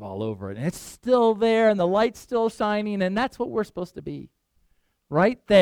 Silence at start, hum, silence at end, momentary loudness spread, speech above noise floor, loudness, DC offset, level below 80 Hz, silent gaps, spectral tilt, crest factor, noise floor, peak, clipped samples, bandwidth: 0 s; none; 0 s; 15 LU; 44 dB; -23 LUFS; under 0.1%; -56 dBFS; none; -6 dB/octave; 18 dB; -67 dBFS; -4 dBFS; under 0.1%; 15 kHz